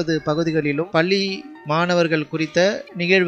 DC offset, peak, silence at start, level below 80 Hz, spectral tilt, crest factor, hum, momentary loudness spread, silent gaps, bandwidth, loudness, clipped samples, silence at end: under 0.1%; -2 dBFS; 0 s; -58 dBFS; -5.5 dB/octave; 18 dB; none; 6 LU; none; 8.4 kHz; -20 LUFS; under 0.1%; 0 s